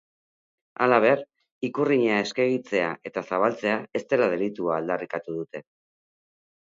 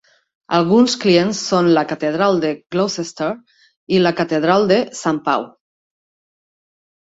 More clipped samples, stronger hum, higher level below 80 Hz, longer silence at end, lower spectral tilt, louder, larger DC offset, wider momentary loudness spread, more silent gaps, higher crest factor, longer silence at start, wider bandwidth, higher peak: neither; neither; second, -72 dBFS vs -60 dBFS; second, 1.05 s vs 1.55 s; about the same, -6 dB/octave vs -5 dB/octave; second, -25 LUFS vs -17 LUFS; neither; first, 13 LU vs 9 LU; about the same, 1.51-1.61 s vs 3.77-3.87 s; first, 24 dB vs 16 dB; first, 0.8 s vs 0.5 s; about the same, 7.6 kHz vs 8 kHz; about the same, -2 dBFS vs -2 dBFS